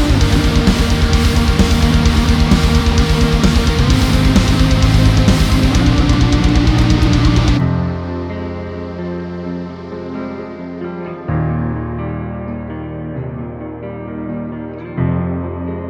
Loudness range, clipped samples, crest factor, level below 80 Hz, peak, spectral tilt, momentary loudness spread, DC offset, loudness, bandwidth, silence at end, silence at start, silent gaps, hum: 11 LU; under 0.1%; 14 dB; -18 dBFS; 0 dBFS; -6 dB/octave; 13 LU; under 0.1%; -15 LUFS; 16.5 kHz; 0 s; 0 s; none; none